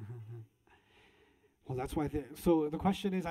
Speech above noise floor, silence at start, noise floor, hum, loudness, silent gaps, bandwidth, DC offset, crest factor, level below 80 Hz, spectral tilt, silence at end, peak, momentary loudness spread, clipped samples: 35 dB; 0 s; -68 dBFS; none; -34 LUFS; none; 16 kHz; under 0.1%; 18 dB; -54 dBFS; -7 dB/octave; 0 s; -18 dBFS; 20 LU; under 0.1%